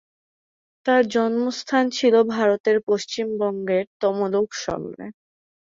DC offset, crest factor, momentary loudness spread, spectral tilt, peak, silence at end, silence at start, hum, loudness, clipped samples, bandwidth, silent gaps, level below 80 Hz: under 0.1%; 16 dB; 11 LU; -4.5 dB/octave; -6 dBFS; 0.65 s; 0.85 s; none; -22 LUFS; under 0.1%; 7.6 kHz; 2.60-2.64 s, 2.83-2.87 s, 3.87-4.00 s; -62 dBFS